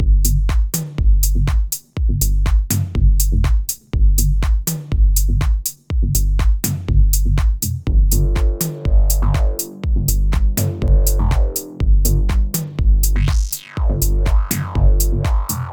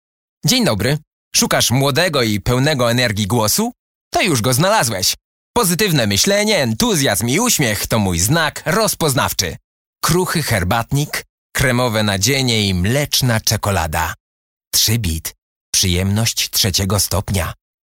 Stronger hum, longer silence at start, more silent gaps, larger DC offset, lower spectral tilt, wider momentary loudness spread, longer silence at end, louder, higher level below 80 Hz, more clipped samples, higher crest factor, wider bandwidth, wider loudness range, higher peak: neither; second, 0 s vs 0.45 s; second, none vs 1.07-1.31 s, 3.79-4.11 s, 5.24-5.54 s, 9.64-9.93 s, 11.29-11.50 s, 14.20-14.60 s, 14.67-14.71 s, 15.42-15.73 s; first, 0.2% vs under 0.1%; first, -5 dB/octave vs -3.5 dB/octave; about the same, 5 LU vs 7 LU; second, 0 s vs 0.4 s; about the same, -18 LUFS vs -16 LUFS; first, -16 dBFS vs -38 dBFS; neither; about the same, 12 dB vs 16 dB; first, over 20 kHz vs 17 kHz; about the same, 1 LU vs 3 LU; about the same, -2 dBFS vs 0 dBFS